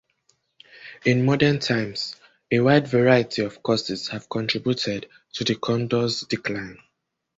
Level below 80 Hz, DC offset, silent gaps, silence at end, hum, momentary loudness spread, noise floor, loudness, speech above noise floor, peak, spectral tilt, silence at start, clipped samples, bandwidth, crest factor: -58 dBFS; under 0.1%; none; 0.65 s; none; 14 LU; -75 dBFS; -23 LUFS; 53 dB; -2 dBFS; -5.5 dB/octave; 0.75 s; under 0.1%; 8 kHz; 20 dB